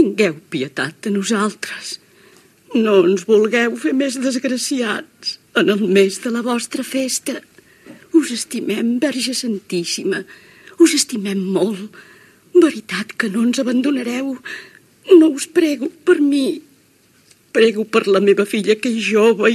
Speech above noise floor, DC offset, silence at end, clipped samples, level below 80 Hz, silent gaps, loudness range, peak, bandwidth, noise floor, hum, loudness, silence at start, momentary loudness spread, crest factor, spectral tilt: 37 dB; under 0.1%; 0 s; under 0.1%; -74 dBFS; none; 4 LU; 0 dBFS; 14 kHz; -54 dBFS; none; -17 LUFS; 0 s; 12 LU; 18 dB; -4 dB/octave